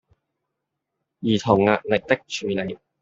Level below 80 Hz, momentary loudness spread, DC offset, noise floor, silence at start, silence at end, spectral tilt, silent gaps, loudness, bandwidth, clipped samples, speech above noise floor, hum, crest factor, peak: -58 dBFS; 10 LU; under 0.1%; -81 dBFS; 1.2 s; 0.25 s; -5.5 dB/octave; none; -22 LUFS; 7.8 kHz; under 0.1%; 60 dB; none; 22 dB; -2 dBFS